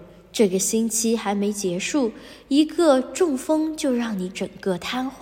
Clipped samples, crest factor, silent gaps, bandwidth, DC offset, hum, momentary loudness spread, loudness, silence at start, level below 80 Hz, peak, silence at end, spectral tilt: under 0.1%; 16 dB; none; 16.5 kHz; under 0.1%; none; 9 LU; -22 LUFS; 0 s; -58 dBFS; -6 dBFS; 0 s; -4 dB/octave